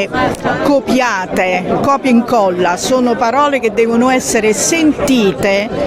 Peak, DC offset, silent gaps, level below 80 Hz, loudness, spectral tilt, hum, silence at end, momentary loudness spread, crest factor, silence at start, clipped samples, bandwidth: -2 dBFS; under 0.1%; none; -40 dBFS; -12 LUFS; -4 dB/octave; none; 0 s; 3 LU; 12 dB; 0 s; under 0.1%; 16 kHz